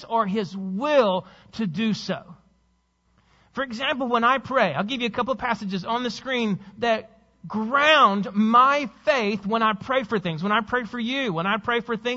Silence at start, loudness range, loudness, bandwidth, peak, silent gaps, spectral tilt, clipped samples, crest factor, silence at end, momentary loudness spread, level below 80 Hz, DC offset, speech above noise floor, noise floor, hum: 0 s; 6 LU; -23 LUFS; 8 kHz; -4 dBFS; none; -5.5 dB/octave; under 0.1%; 20 dB; 0 s; 12 LU; -60 dBFS; under 0.1%; 44 dB; -67 dBFS; none